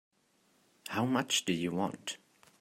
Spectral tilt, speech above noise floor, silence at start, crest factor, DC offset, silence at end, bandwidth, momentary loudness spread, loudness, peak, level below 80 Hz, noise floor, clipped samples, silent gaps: -3.5 dB/octave; 38 dB; 0.85 s; 22 dB; under 0.1%; 0.45 s; 16 kHz; 14 LU; -33 LUFS; -14 dBFS; -76 dBFS; -71 dBFS; under 0.1%; none